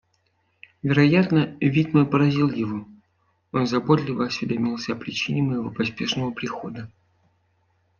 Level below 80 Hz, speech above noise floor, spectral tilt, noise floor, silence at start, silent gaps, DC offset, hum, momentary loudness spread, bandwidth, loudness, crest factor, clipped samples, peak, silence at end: -58 dBFS; 46 dB; -7 dB/octave; -68 dBFS; 0.85 s; none; under 0.1%; none; 12 LU; 7 kHz; -23 LUFS; 20 dB; under 0.1%; -4 dBFS; 1.15 s